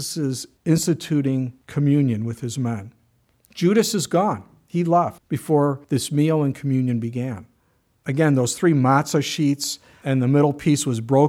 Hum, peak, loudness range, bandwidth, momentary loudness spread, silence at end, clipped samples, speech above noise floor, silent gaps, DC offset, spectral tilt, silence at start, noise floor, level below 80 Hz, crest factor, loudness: none; -4 dBFS; 3 LU; 16.5 kHz; 10 LU; 0 s; under 0.1%; 44 dB; none; under 0.1%; -6 dB/octave; 0 s; -64 dBFS; -60 dBFS; 16 dB; -21 LUFS